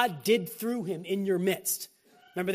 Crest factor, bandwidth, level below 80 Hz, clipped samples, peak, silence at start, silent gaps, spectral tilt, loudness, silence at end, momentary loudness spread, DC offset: 20 dB; 15.5 kHz; -76 dBFS; under 0.1%; -8 dBFS; 0 s; none; -4 dB/octave; -30 LUFS; 0 s; 7 LU; under 0.1%